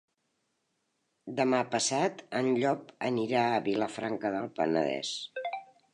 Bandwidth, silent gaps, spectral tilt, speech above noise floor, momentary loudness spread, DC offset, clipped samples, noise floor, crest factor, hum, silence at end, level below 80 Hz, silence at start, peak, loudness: 11 kHz; none; -4 dB/octave; 49 dB; 10 LU; under 0.1%; under 0.1%; -78 dBFS; 20 dB; none; 0.3 s; -76 dBFS; 1.25 s; -12 dBFS; -31 LUFS